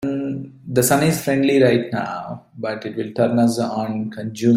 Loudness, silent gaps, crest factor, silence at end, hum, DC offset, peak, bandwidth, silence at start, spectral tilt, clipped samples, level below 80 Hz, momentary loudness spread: -20 LUFS; none; 16 dB; 0 s; none; under 0.1%; -2 dBFS; 16 kHz; 0 s; -5.5 dB/octave; under 0.1%; -56 dBFS; 12 LU